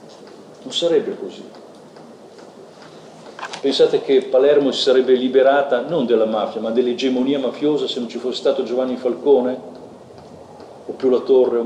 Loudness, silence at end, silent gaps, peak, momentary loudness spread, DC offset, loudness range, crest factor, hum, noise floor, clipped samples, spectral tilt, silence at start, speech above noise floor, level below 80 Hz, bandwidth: -18 LUFS; 0 s; none; -4 dBFS; 18 LU; under 0.1%; 8 LU; 16 dB; none; -41 dBFS; under 0.1%; -4.5 dB/octave; 0.05 s; 24 dB; -70 dBFS; 9.6 kHz